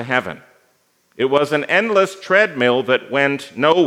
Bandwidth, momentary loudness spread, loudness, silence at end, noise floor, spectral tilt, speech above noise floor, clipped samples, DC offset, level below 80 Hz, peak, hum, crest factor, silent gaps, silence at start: 14.5 kHz; 6 LU; -17 LUFS; 0 s; -61 dBFS; -5 dB/octave; 44 dB; under 0.1%; under 0.1%; -70 dBFS; 0 dBFS; none; 18 dB; none; 0 s